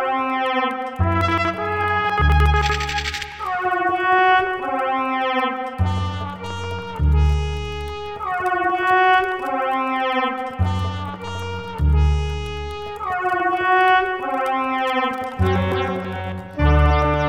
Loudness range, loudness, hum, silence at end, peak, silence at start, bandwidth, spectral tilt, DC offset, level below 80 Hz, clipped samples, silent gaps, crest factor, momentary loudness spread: 4 LU; -20 LUFS; none; 0 s; -4 dBFS; 0 s; 9.2 kHz; -6 dB/octave; under 0.1%; -26 dBFS; under 0.1%; none; 16 dB; 12 LU